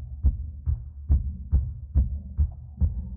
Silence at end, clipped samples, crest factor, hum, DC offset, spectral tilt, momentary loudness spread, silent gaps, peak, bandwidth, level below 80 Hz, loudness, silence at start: 0 s; under 0.1%; 16 dB; none; under 0.1%; -15 dB/octave; 5 LU; none; -10 dBFS; 1.3 kHz; -26 dBFS; -29 LUFS; 0 s